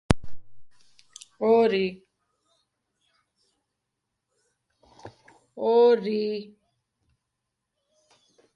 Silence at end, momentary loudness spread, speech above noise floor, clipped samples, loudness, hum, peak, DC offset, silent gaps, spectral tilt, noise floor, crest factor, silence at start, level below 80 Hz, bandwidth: 2.1 s; 16 LU; 60 dB; under 0.1%; -23 LUFS; none; 0 dBFS; under 0.1%; none; -6.5 dB/octave; -82 dBFS; 28 dB; 0.1 s; -50 dBFS; 11.5 kHz